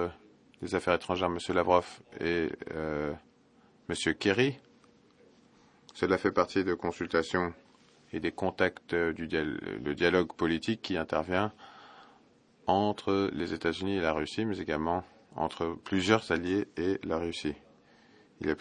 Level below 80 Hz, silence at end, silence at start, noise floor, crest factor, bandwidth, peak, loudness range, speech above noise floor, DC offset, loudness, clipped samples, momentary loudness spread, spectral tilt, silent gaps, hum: -60 dBFS; 0 s; 0 s; -63 dBFS; 24 dB; 10.5 kHz; -8 dBFS; 2 LU; 32 dB; under 0.1%; -31 LUFS; under 0.1%; 10 LU; -5.5 dB/octave; none; none